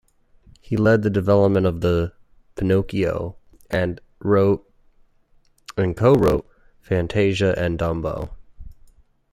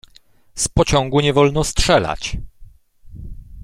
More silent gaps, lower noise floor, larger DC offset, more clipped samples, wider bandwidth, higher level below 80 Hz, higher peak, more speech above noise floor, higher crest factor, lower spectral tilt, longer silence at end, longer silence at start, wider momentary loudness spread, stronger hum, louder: neither; first, -57 dBFS vs -50 dBFS; neither; neither; second, 14 kHz vs 15.5 kHz; second, -42 dBFS vs -30 dBFS; about the same, -2 dBFS vs -2 dBFS; first, 38 dB vs 34 dB; about the same, 20 dB vs 18 dB; first, -8 dB/octave vs -4.5 dB/octave; first, 0.6 s vs 0 s; first, 0.7 s vs 0.55 s; second, 12 LU vs 23 LU; neither; second, -21 LUFS vs -17 LUFS